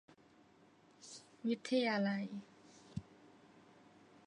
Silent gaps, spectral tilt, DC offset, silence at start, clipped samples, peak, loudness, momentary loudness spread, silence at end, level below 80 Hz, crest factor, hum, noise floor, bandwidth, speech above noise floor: none; -5.5 dB/octave; under 0.1%; 1 s; under 0.1%; -24 dBFS; -39 LUFS; 23 LU; 1.25 s; -76 dBFS; 20 dB; none; -67 dBFS; 10 kHz; 30 dB